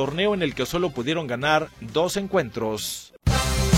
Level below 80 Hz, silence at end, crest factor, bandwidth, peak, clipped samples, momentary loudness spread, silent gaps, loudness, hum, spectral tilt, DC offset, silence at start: -34 dBFS; 0 s; 20 dB; 16.5 kHz; -4 dBFS; under 0.1%; 6 LU; none; -24 LUFS; none; -4.5 dB/octave; under 0.1%; 0 s